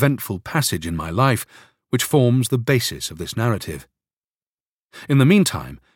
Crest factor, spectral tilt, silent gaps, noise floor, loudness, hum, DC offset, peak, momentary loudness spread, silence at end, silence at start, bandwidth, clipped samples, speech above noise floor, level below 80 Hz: 20 dB; -5.5 dB/octave; 4.13-4.89 s; under -90 dBFS; -20 LUFS; none; under 0.1%; -2 dBFS; 14 LU; 0.2 s; 0 s; 17 kHz; under 0.1%; over 71 dB; -46 dBFS